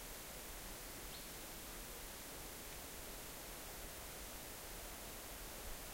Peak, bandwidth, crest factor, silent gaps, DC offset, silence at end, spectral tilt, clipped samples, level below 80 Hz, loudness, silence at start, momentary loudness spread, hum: -36 dBFS; 16 kHz; 16 dB; none; under 0.1%; 0 s; -2 dB/octave; under 0.1%; -58 dBFS; -49 LUFS; 0 s; 0 LU; none